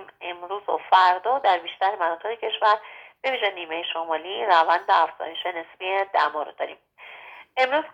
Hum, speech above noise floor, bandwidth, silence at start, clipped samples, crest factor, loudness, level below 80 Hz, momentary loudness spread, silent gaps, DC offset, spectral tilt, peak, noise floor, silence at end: none; 21 dB; 8 kHz; 0 s; under 0.1%; 20 dB; -23 LUFS; -78 dBFS; 15 LU; none; under 0.1%; -2.5 dB/octave; -4 dBFS; -44 dBFS; 0 s